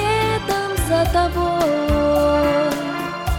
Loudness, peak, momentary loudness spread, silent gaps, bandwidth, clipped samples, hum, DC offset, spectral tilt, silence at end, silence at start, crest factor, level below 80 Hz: -19 LUFS; -4 dBFS; 5 LU; none; 17.5 kHz; under 0.1%; none; under 0.1%; -5.5 dB/octave; 0 s; 0 s; 14 dB; -30 dBFS